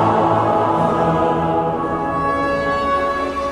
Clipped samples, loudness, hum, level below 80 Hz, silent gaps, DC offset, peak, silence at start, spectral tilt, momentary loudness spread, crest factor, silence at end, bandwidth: under 0.1%; -18 LUFS; none; -42 dBFS; none; under 0.1%; -2 dBFS; 0 s; -7 dB/octave; 4 LU; 14 dB; 0 s; 12 kHz